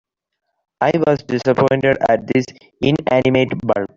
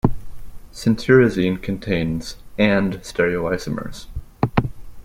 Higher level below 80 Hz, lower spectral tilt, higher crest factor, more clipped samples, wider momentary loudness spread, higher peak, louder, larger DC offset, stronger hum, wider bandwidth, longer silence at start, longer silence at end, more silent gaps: second, -50 dBFS vs -36 dBFS; about the same, -7 dB/octave vs -6.5 dB/octave; about the same, 14 dB vs 18 dB; neither; second, 5 LU vs 18 LU; about the same, -2 dBFS vs -2 dBFS; first, -17 LUFS vs -20 LUFS; neither; neither; second, 7.6 kHz vs 16 kHz; first, 0.8 s vs 0.05 s; about the same, 0.1 s vs 0 s; neither